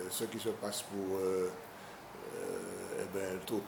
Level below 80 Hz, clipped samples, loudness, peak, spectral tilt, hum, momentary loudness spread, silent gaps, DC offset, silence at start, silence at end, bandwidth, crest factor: -72 dBFS; under 0.1%; -39 LUFS; -24 dBFS; -4 dB/octave; none; 13 LU; none; under 0.1%; 0 s; 0 s; 20 kHz; 14 dB